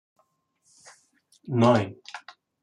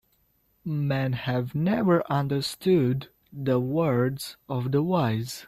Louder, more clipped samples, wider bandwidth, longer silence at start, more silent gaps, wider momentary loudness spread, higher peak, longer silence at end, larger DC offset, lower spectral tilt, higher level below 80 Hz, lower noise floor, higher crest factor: first, -23 LUFS vs -26 LUFS; neither; second, 10.5 kHz vs 14.5 kHz; first, 1.45 s vs 0.65 s; neither; first, 22 LU vs 10 LU; about the same, -8 dBFS vs -10 dBFS; first, 0.45 s vs 0 s; neither; about the same, -7 dB/octave vs -7 dB/octave; second, -68 dBFS vs -60 dBFS; about the same, -70 dBFS vs -68 dBFS; about the same, 20 dB vs 16 dB